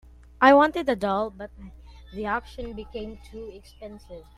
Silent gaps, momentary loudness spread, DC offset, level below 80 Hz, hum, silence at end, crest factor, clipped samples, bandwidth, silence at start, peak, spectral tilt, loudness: none; 26 LU; under 0.1%; -48 dBFS; none; 0.15 s; 22 dB; under 0.1%; 12.5 kHz; 0.4 s; -4 dBFS; -6 dB/octave; -22 LUFS